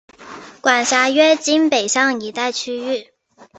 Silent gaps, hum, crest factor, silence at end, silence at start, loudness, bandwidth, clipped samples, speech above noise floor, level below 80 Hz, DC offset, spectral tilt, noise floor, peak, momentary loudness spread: none; none; 16 dB; 0.15 s; 0.2 s; -16 LUFS; 8.4 kHz; under 0.1%; 21 dB; -66 dBFS; under 0.1%; -1 dB/octave; -38 dBFS; -2 dBFS; 12 LU